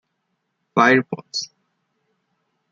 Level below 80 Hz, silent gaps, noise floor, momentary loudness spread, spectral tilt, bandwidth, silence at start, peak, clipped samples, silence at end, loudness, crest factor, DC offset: -70 dBFS; none; -74 dBFS; 13 LU; -4.5 dB/octave; 7.6 kHz; 0.75 s; -2 dBFS; under 0.1%; 1.25 s; -19 LUFS; 22 dB; under 0.1%